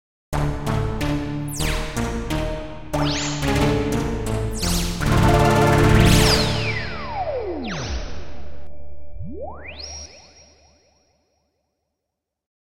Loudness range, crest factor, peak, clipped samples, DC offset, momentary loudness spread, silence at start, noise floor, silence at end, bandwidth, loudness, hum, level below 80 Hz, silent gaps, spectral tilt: 20 LU; 20 dB; -2 dBFS; under 0.1%; under 0.1%; 19 LU; 0.3 s; -82 dBFS; 0.15 s; 17 kHz; -21 LUFS; none; -30 dBFS; none; -5 dB/octave